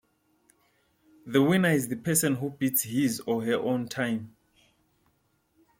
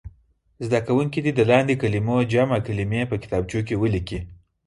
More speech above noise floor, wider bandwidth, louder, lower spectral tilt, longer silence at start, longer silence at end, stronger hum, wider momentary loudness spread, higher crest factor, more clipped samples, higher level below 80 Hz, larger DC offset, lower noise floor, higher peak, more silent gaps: first, 44 dB vs 38 dB; first, 16.5 kHz vs 11.5 kHz; second, -27 LUFS vs -22 LUFS; second, -4.5 dB/octave vs -7.5 dB/octave; first, 1.25 s vs 0.05 s; first, 1.5 s vs 0.35 s; neither; second, 7 LU vs 10 LU; about the same, 20 dB vs 20 dB; neither; second, -68 dBFS vs -44 dBFS; neither; first, -71 dBFS vs -59 dBFS; second, -8 dBFS vs -4 dBFS; neither